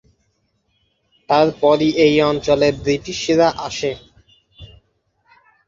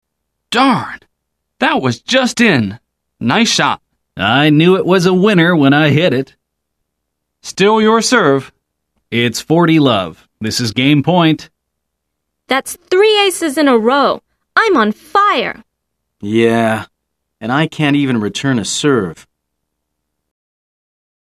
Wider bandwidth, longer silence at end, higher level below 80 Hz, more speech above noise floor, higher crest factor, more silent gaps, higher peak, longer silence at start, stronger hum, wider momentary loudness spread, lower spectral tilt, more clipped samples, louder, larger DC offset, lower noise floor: second, 7.6 kHz vs 14.5 kHz; second, 1 s vs 2.15 s; first, -48 dBFS vs -54 dBFS; second, 50 dB vs 62 dB; about the same, 18 dB vs 14 dB; neither; about the same, -2 dBFS vs 0 dBFS; first, 1.3 s vs 0.5 s; neither; about the same, 10 LU vs 12 LU; about the same, -5 dB/octave vs -5 dB/octave; neither; second, -17 LUFS vs -13 LUFS; neither; second, -66 dBFS vs -74 dBFS